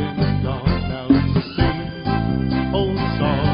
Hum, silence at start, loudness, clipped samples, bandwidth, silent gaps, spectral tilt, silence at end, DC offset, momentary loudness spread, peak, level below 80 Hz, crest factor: none; 0 s; -20 LUFS; under 0.1%; 5.4 kHz; none; -6 dB/octave; 0 s; under 0.1%; 5 LU; -2 dBFS; -30 dBFS; 16 dB